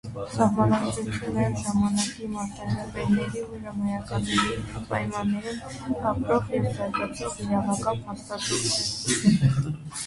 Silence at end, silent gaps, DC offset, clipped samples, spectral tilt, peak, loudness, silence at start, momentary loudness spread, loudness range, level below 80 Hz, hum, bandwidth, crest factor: 0 s; none; under 0.1%; under 0.1%; -5 dB/octave; -8 dBFS; -26 LUFS; 0.05 s; 10 LU; 3 LU; -48 dBFS; none; 11.5 kHz; 18 dB